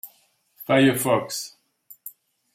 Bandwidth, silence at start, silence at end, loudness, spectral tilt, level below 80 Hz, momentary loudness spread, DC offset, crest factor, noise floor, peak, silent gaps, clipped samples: 16.5 kHz; 0.05 s; 0.45 s; -21 LUFS; -4.5 dB/octave; -68 dBFS; 23 LU; under 0.1%; 20 dB; -62 dBFS; -4 dBFS; none; under 0.1%